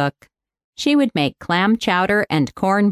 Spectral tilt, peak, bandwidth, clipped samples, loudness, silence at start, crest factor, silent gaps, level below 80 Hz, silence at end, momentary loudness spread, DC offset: -5.5 dB/octave; -4 dBFS; 13.5 kHz; under 0.1%; -18 LUFS; 0 s; 14 dB; 0.64-0.73 s; -54 dBFS; 0 s; 5 LU; under 0.1%